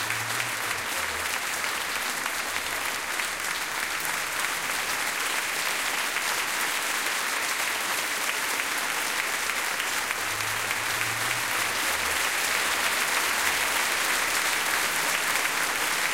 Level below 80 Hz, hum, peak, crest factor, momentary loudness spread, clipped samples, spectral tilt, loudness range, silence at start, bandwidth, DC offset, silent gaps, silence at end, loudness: -60 dBFS; none; -10 dBFS; 18 dB; 4 LU; under 0.1%; 0 dB/octave; 4 LU; 0 s; 17 kHz; 0.2%; none; 0 s; -25 LUFS